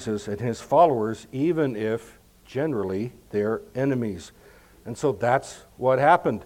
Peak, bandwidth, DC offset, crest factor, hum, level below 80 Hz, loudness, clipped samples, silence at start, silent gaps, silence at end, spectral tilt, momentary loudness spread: -4 dBFS; 16.5 kHz; under 0.1%; 20 dB; none; -58 dBFS; -24 LUFS; under 0.1%; 0 s; none; 0 s; -6.5 dB/octave; 13 LU